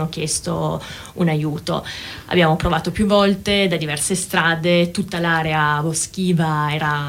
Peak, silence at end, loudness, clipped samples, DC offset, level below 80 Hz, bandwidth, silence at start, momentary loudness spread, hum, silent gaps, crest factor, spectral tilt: -4 dBFS; 0 s; -19 LUFS; under 0.1%; under 0.1%; -40 dBFS; 16.5 kHz; 0 s; 8 LU; none; none; 16 dB; -4.5 dB/octave